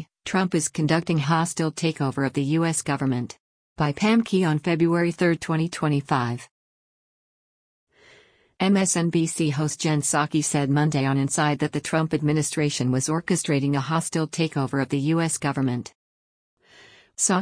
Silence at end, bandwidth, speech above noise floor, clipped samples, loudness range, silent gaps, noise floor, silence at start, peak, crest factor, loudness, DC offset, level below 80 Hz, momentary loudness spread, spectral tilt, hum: 0 s; 10.5 kHz; 33 dB; under 0.1%; 4 LU; 3.40-3.76 s, 6.51-7.87 s, 15.95-16.57 s; -56 dBFS; 0 s; -8 dBFS; 16 dB; -23 LUFS; under 0.1%; -60 dBFS; 5 LU; -5 dB/octave; none